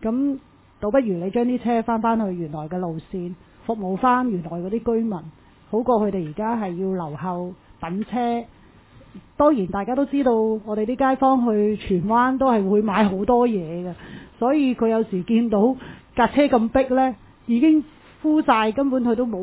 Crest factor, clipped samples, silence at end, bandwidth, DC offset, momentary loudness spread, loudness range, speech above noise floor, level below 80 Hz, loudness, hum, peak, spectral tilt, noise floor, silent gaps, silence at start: 16 dB; under 0.1%; 0 s; 4 kHz; under 0.1%; 12 LU; 5 LU; 28 dB; -50 dBFS; -21 LUFS; none; -4 dBFS; -11 dB/octave; -49 dBFS; none; 0 s